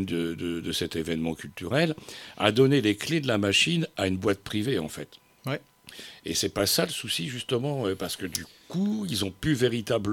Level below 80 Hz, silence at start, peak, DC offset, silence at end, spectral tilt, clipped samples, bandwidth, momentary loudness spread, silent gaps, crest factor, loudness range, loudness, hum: -56 dBFS; 0 s; -4 dBFS; under 0.1%; 0 s; -4.5 dB/octave; under 0.1%; 18 kHz; 15 LU; none; 24 dB; 4 LU; -27 LUFS; none